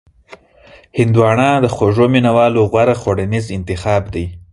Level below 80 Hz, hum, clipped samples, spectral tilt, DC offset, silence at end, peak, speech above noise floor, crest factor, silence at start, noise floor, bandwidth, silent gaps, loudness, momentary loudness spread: -36 dBFS; none; under 0.1%; -7 dB/octave; under 0.1%; 0.15 s; 0 dBFS; 29 dB; 14 dB; 0.3 s; -42 dBFS; 11.5 kHz; none; -14 LUFS; 10 LU